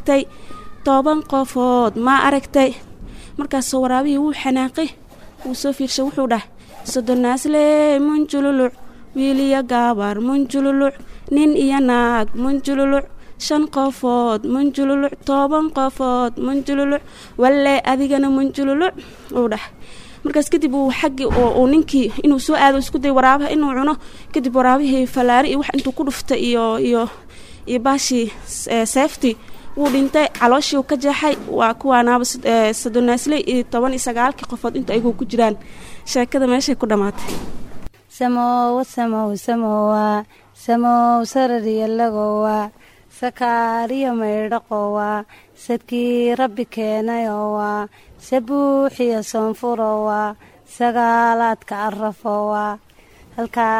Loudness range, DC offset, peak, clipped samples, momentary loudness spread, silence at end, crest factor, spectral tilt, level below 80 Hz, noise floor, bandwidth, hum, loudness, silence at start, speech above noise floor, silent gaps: 4 LU; under 0.1%; 0 dBFS; under 0.1%; 10 LU; 0 s; 18 dB; -4 dB/octave; -42 dBFS; -46 dBFS; 15.5 kHz; none; -18 LUFS; 0 s; 29 dB; none